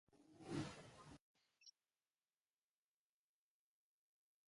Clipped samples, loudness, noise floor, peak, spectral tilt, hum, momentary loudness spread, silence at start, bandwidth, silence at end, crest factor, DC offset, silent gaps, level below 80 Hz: under 0.1%; -53 LUFS; under -90 dBFS; -34 dBFS; -5.5 dB/octave; none; 18 LU; 0.1 s; 11.5 kHz; 2.8 s; 26 dB; under 0.1%; 1.21-1.35 s; -80 dBFS